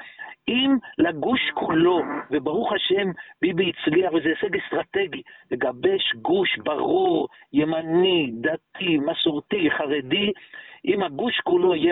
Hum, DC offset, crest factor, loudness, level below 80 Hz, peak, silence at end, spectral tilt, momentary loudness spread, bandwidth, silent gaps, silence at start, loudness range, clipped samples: none; under 0.1%; 14 dB; -23 LUFS; -62 dBFS; -8 dBFS; 0 s; -9.5 dB/octave; 7 LU; 4.1 kHz; none; 0 s; 1 LU; under 0.1%